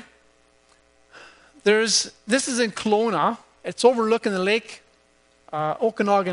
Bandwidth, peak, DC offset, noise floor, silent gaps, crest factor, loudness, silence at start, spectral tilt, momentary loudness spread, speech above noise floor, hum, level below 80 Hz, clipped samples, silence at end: 11 kHz; -4 dBFS; under 0.1%; -60 dBFS; none; 20 dB; -22 LUFS; 1.15 s; -3 dB/octave; 10 LU; 39 dB; none; -68 dBFS; under 0.1%; 0 s